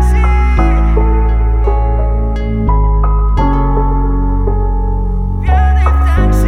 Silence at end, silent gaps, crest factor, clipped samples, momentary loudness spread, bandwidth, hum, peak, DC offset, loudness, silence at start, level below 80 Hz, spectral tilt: 0 s; none; 10 dB; under 0.1%; 5 LU; 6.2 kHz; none; 0 dBFS; under 0.1%; -13 LUFS; 0 s; -10 dBFS; -8.5 dB/octave